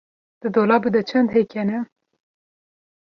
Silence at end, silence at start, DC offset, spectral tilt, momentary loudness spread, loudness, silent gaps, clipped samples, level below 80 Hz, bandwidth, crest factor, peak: 1.2 s; 0.45 s; under 0.1%; -8 dB/octave; 12 LU; -20 LUFS; none; under 0.1%; -62 dBFS; 6.2 kHz; 18 dB; -4 dBFS